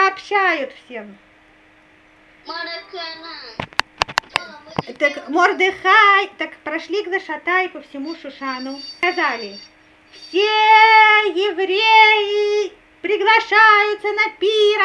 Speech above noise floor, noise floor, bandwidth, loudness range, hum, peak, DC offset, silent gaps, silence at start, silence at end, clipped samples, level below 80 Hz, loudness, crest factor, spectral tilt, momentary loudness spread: 34 dB; -51 dBFS; 12 kHz; 13 LU; none; 0 dBFS; under 0.1%; none; 0 s; 0 s; under 0.1%; -58 dBFS; -15 LUFS; 18 dB; -3 dB/octave; 19 LU